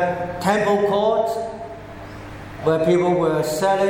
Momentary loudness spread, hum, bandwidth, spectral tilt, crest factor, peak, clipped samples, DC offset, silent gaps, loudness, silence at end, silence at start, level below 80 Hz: 18 LU; none; 17 kHz; -6 dB/octave; 16 dB; -6 dBFS; under 0.1%; under 0.1%; none; -20 LUFS; 0 s; 0 s; -48 dBFS